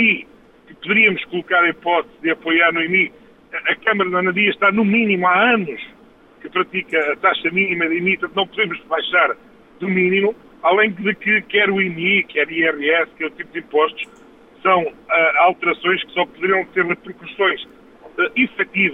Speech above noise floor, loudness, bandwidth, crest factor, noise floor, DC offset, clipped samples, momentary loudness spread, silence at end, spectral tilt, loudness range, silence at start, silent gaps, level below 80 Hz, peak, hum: 30 dB; -17 LUFS; 4.5 kHz; 18 dB; -48 dBFS; under 0.1%; under 0.1%; 10 LU; 0 s; -7 dB/octave; 2 LU; 0 s; none; -60 dBFS; -2 dBFS; none